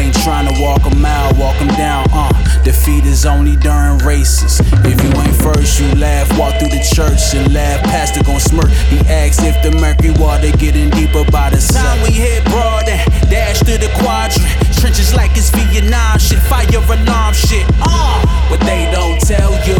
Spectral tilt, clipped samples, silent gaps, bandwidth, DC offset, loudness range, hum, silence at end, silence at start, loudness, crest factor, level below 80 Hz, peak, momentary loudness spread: -5 dB/octave; under 0.1%; none; 18.5 kHz; under 0.1%; 1 LU; none; 0 s; 0 s; -11 LUFS; 10 dB; -12 dBFS; 0 dBFS; 2 LU